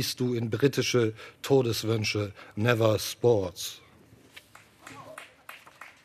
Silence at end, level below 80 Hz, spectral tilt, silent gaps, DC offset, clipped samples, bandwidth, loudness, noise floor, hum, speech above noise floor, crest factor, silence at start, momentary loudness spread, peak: 0.15 s; -66 dBFS; -5 dB/octave; none; under 0.1%; under 0.1%; 14 kHz; -27 LUFS; -56 dBFS; none; 29 dB; 22 dB; 0 s; 22 LU; -6 dBFS